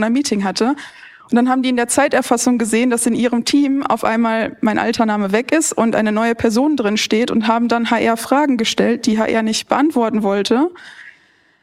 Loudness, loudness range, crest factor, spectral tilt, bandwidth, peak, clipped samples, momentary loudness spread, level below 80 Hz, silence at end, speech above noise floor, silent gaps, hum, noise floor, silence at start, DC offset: -16 LUFS; 1 LU; 16 dB; -4 dB/octave; 15.5 kHz; 0 dBFS; under 0.1%; 3 LU; -56 dBFS; 0.5 s; 37 dB; none; none; -53 dBFS; 0 s; under 0.1%